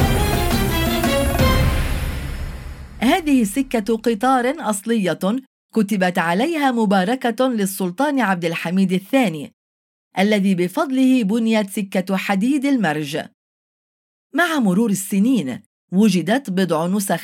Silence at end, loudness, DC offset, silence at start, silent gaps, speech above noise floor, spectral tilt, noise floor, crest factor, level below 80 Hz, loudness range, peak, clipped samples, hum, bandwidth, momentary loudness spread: 0 s; -19 LUFS; under 0.1%; 0 s; 5.47-5.69 s, 9.53-10.11 s, 13.34-14.30 s, 15.66-15.88 s; over 72 dB; -5.5 dB/octave; under -90 dBFS; 14 dB; -32 dBFS; 2 LU; -4 dBFS; under 0.1%; none; 17 kHz; 9 LU